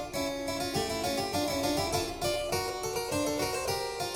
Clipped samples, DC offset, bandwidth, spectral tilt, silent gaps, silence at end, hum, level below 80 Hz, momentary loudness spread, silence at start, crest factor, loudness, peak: under 0.1%; under 0.1%; 17 kHz; -3.5 dB/octave; none; 0 s; none; -50 dBFS; 3 LU; 0 s; 14 dB; -31 LUFS; -18 dBFS